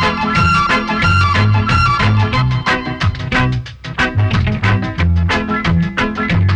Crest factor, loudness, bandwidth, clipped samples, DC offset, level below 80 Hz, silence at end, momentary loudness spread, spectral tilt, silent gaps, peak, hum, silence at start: 10 dB; -14 LUFS; 9 kHz; under 0.1%; under 0.1%; -26 dBFS; 0 s; 5 LU; -6 dB/octave; none; -4 dBFS; none; 0 s